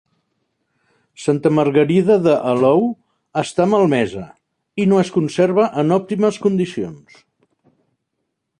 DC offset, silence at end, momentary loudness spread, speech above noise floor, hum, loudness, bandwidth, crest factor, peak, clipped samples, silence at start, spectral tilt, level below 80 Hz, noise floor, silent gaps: under 0.1%; 1.65 s; 11 LU; 59 dB; none; -17 LUFS; 10.5 kHz; 16 dB; -2 dBFS; under 0.1%; 1.2 s; -7 dB/octave; -58 dBFS; -75 dBFS; none